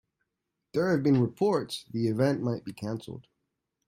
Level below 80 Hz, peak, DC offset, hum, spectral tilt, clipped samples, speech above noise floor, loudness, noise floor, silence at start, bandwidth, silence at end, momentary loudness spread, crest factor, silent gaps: -68 dBFS; -12 dBFS; under 0.1%; none; -7 dB/octave; under 0.1%; 56 dB; -29 LUFS; -84 dBFS; 0.75 s; 16 kHz; 0.65 s; 12 LU; 16 dB; none